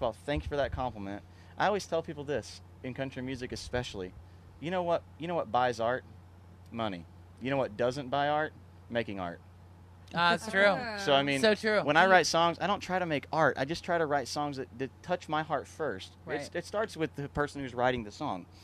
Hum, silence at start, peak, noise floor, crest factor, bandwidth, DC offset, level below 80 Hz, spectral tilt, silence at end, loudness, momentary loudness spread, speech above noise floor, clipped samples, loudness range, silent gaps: none; 0 s; -10 dBFS; -53 dBFS; 22 dB; 13.5 kHz; under 0.1%; -54 dBFS; -4.5 dB/octave; 0 s; -31 LUFS; 14 LU; 22 dB; under 0.1%; 9 LU; none